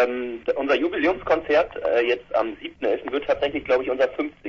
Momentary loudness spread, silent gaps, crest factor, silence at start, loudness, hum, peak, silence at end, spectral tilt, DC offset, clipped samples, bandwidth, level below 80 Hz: 5 LU; none; 18 dB; 0 s; -23 LUFS; none; -6 dBFS; 0 s; -5.5 dB/octave; under 0.1%; under 0.1%; 7 kHz; -52 dBFS